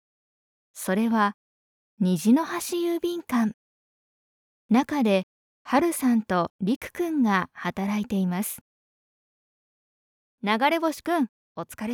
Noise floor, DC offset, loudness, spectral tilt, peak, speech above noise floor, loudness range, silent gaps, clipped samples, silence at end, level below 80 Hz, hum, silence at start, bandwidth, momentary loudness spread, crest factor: under -90 dBFS; under 0.1%; -25 LUFS; -5.5 dB/octave; -8 dBFS; over 66 dB; 4 LU; 1.34-1.97 s, 3.54-4.69 s, 5.23-5.65 s, 6.50-6.59 s, 6.76-6.81 s, 8.61-10.38 s, 11.29-11.55 s; under 0.1%; 0 s; -66 dBFS; none; 0.75 s; over 20 kHz; 9 LU; 20 dB